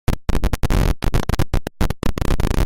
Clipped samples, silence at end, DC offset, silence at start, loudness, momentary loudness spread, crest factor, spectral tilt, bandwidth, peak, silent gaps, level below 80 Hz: under 0.1%; 0 s; under 0.1%; 0.1 s; -22 LUFS; 4 LU; 12 dB; -6 dB/octave; 17 kHz; -4 dBFS; none; -20 dBFS